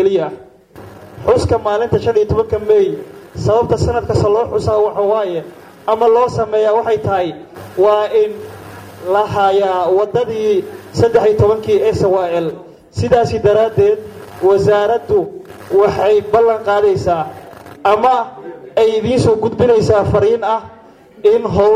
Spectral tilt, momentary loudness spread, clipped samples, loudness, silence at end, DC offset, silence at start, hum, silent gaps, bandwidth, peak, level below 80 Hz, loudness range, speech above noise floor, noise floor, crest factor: -7 dB/octave; 13 LU; under 0.1%; -14 LUFS; 0 s; under 0.1%; 0 s; none; none; 14.5 kHz; -2 dBFS; -38 dBFS; 2 LU; 24 dB; -37 dBFS; 12 dB